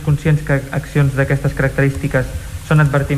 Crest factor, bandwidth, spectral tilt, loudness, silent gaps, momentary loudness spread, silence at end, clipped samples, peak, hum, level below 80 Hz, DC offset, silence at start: 14 dB; 14.5 kHz; -7.5 dB/octave; -16 LUFS; none; 6 LU; 0 s; under 0.1%; -2 dBFS; none; -30 dBFS; under 0.1%; 0 s